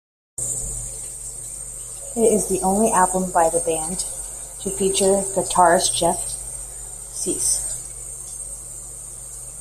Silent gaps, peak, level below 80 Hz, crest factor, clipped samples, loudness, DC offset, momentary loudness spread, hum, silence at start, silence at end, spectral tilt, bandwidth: none; -2 dBFS; -42 dBFS; 20 dB; under 0.1%; -21 LUFS; under 0.1%; 15 LU; none; 0.4 s; 0 s; -3 dB/octave; 16 kHz